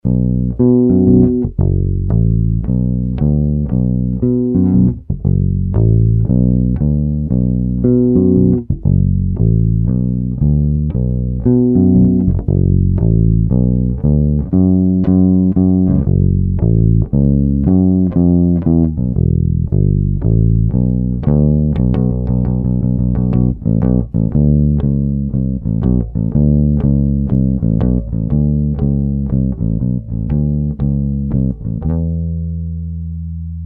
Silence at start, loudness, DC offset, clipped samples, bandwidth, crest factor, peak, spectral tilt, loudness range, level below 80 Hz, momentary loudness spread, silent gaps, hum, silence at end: 0.05 s; -14 LUFS; under 0.1%; under 0.1%; 2 kHz; 12 dB; 0 dBFS; -14.5 dB/octave; 3 LU; -22 dBFS; 6 LU; none; none; 0 s